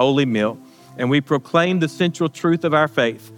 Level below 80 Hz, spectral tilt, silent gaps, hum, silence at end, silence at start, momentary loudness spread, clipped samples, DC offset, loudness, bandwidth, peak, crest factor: -70 dBFS; -6 dB/octave; none; none; 0 s; 0 s; 5 LU; under 0.1%; under 0.1%; -19 LUFS; 17 kHz; -4 dBFS; 16 dB